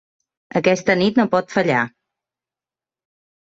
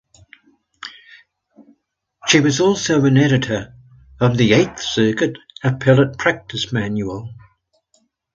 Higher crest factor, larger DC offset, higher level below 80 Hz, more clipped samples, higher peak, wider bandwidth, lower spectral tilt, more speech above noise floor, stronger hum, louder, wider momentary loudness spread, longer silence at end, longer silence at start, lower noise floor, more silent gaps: about the same, 18 dB vs 18 dB; neither; second, -58 dBFS vs -50 dBFS; neither; second, -4 dBFS vs 0 dBFS; about the same, 7.8 kHz vs 7.8 kHz; about the same, -5.5 dB/octave vs -5 dB/octave; first, over 73 dB vs 51 dB; neither; about the same, -18 LUFS vs -17 LUFS; second, 6 LU vs 19 LU; first, 1.55 s vs 0.95 s; second, 0.55 s vs 0.85 s; first, under -90 dBFS vs -67 dBFS; neither